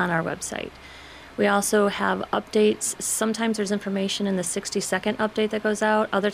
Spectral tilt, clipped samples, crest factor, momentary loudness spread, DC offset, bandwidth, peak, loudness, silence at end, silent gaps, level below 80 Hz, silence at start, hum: -3.5 dB/octave; under 0.1%; 16 dB; 10 LU; under 0.1%; 15.5 kHz; -8 dBFS; -24 LUFS; 0 s; none; -56 dBFS; 0 s; none